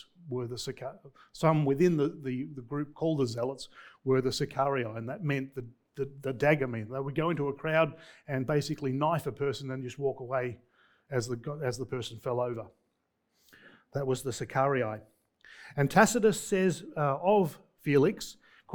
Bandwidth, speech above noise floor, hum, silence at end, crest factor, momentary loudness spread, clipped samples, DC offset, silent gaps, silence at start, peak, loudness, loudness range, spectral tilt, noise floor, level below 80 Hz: 19 kHz; 48 dB; none; 0 s; 24 dB; 14 LU; under 0.1%; under 0.1%; none; 0.2 s; -6 dBFS; -31 LUFS; 7 LU; -6 dB/octave; -78 dBFS; -62 dBFS